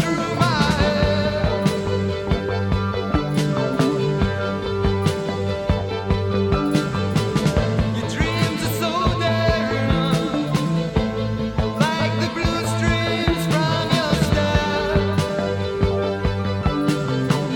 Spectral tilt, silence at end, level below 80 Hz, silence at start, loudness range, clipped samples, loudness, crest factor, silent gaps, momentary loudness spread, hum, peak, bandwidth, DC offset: -6 dB/octave; 0 s; -32 dBFS; 0 s; 2 LU; under 0.1%; -21 LUFS; 16 dB; none; 4 LU; none; -4 dBFS; 17.5 kHz; under 0.1%